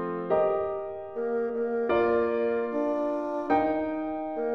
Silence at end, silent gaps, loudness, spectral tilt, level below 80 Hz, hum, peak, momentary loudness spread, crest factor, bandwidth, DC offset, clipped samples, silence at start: 0 s; none; -28 LUFS; -8 dB/octave; -60 dBFS; none; -12 dBFS; 7 LU; 16 dB; 6 kHz; 0.1%; under 0.1%; 0 s